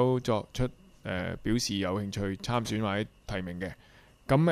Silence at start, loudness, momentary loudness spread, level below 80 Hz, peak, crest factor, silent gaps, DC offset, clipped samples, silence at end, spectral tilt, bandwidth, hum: 0 s; -32 LUFS; 10 LU; -48 dBFS; -12 dBFS; 18 dB; none; under 0.1%; under 0.1%; 0 s; -5.5 dB/octave; 15.5 kHz; none